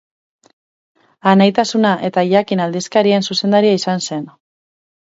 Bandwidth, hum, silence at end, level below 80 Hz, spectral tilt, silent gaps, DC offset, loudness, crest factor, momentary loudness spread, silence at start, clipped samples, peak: 8 kHz; none; 0.85 s; -64 dBFS; -5.5 dB/octave; none; under 0.1%; -15 LUFS; 16 dB; 8 LU; 1.25 s; under 0.1%; 0 dBFS